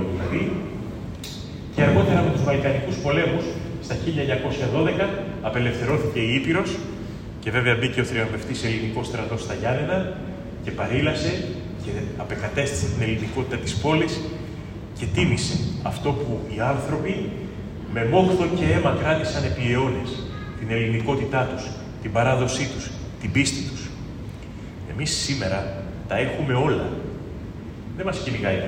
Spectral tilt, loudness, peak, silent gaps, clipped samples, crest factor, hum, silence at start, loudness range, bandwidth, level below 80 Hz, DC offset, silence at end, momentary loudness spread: -5.5 dB/octave; -24 LUFS; -4 dBFS; none; under 0.1%; 20 dB; none; 0 s; 4 LU; 16 kHz; -42 dBFS; under 0.1%; 0 s; 13 LU